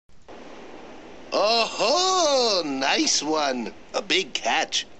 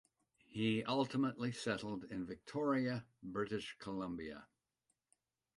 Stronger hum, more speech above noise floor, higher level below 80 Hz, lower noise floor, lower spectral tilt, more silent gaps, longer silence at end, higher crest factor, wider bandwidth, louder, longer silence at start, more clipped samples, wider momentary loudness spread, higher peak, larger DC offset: neither; second, 19 dB vs 46 dB; first, -60 dBFS vs -72 dBFS; second, -44 dBFS vs -86 dBFS; second, -1 dB/octave vs -6 dB/octave; neither; second, 0.15 s vs 1.1 s; about the same, 18 dB vs 20 dB; second, 9 kHz vs 11.5 kHz; first, -22 LUFS vs -41 LUFS; second, 0.3 s vs 0.5 s; neither; first, 23 LU vs 10 LU; first, -6 dBFS vs -22 dBFS; first, 0.5% vs under 0.1%